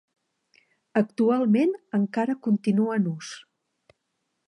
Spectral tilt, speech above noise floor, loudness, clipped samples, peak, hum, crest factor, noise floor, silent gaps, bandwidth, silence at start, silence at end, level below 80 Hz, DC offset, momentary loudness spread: -7.5 dB/octave; 54 dB; -24 LUFS; under 0.1%; -8 dBFS; none; 18 dB; -78 dBFS; none; 11 kHz; 0.95 s; 1.1 s; -78 dBFS; under 0.1%; 10 LU